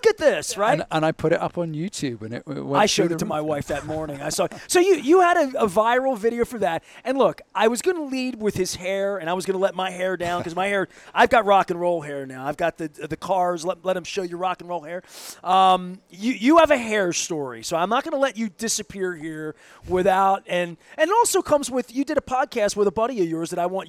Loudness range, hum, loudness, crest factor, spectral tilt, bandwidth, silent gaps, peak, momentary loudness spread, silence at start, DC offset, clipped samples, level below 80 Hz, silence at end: 4 LU; none; -22 LUFS; 18 dB; -4 dB/octave; 16 kHz; none; -4 dBFS; 12 LU; 0.05 s; under 0.1%; under 0.1%; -54 dBFS; 0 s